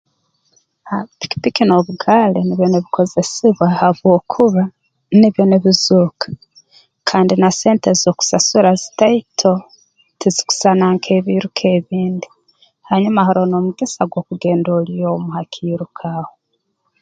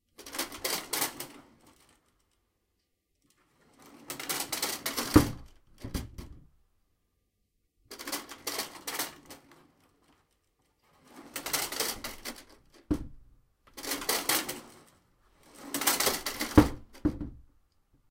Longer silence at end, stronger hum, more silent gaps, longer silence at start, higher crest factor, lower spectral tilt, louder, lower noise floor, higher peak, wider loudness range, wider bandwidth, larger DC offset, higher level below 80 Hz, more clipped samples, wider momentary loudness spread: about the same, 0.75 s vs 0.7 s; neither; neither; first, 0.85 s vs 0.2 s; second, 14 dB vs 30 dB; first, -5 dB/octave vs -3.5 dB/octave; first, -15 LUFS vs -31 LUFS; second, -69 dBFS vs -78 dBFS; first, 0 dBFS vs -4 dBFS; second, 4 LU vs 11 LU; second, 9.2 kHz vs 17 kHz; neither; second, -56 dBFS vs -46 dBFS; neither; second, 12 LU vs 24 LU